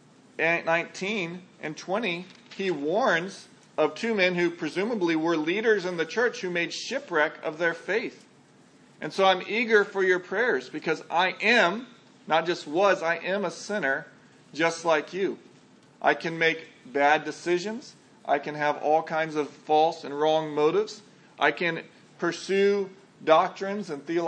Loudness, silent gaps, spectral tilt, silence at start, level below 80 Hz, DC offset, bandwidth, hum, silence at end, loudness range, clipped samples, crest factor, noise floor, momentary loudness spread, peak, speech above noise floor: -26 LUFS; none; -4.5 dB/octave; 0.4 s; -84 dBFS; under 0.1%; 9.8 kHz; none; 0 s; 4 LU; under 0.1%; 22 dB; -56 dBFS; 12 LU; -6 dBFS; 30 dB